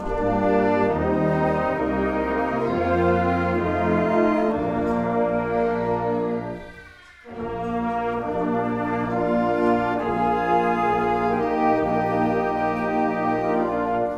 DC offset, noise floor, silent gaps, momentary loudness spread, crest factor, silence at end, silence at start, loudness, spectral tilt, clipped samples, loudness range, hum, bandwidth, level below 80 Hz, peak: under 0.1%; -45 dBFS; none; 5 LU; 14 dB; 0 s; 0 s; -22 LUFS; -8.5 dB/octave; under 0.1%; 5 LU; none; 9.4 kHz; -44 dBFS; -8 dBFS